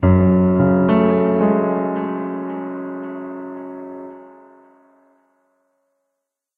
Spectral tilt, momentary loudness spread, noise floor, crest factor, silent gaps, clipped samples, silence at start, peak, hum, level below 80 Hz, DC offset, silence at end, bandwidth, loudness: -12 dB/octave; 18 LU; -79 dBFS; 18 dB; none; under 0.1%; 0 s; -2 dBFS; none; -46 dBFS; under 0.1%; 2.25 s; 3.6 kHz; -18 LUFS